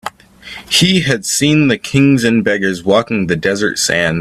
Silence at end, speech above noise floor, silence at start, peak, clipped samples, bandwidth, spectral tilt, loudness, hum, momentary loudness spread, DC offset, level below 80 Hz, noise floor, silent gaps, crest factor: 0 s; 22 dB; 0.05 s; 0 dBFS; under 0.1%; 14.5 kHz; -4 dB/octave; -13 LUFS; none; 5 LU; under 0.1%; -46 dBFS; -34 dBFS; none; 14 dB